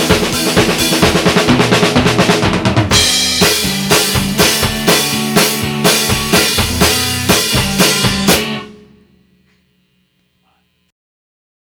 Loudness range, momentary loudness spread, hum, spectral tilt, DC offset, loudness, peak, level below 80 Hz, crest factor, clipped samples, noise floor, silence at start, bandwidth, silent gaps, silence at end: 6 LU; 3 LU; none; -3 dB/octave; under 0.1%; -11 LUFS; 0 dBFS; -32 dBFS; 14 dB; under 0.1%; -59 dBFS; 0 s; over 20 kHz; none; 3.05 s